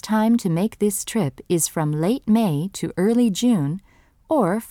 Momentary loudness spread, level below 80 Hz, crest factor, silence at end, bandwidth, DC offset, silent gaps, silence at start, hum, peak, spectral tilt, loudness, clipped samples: 6 LU; -56 dBFS; 14 dB; 0 s; 17 kHz; under 0.1%; none; 0.05 s; none; -8 dBFS; -5.5 dB/octave; -21 LUFS; under 0.1%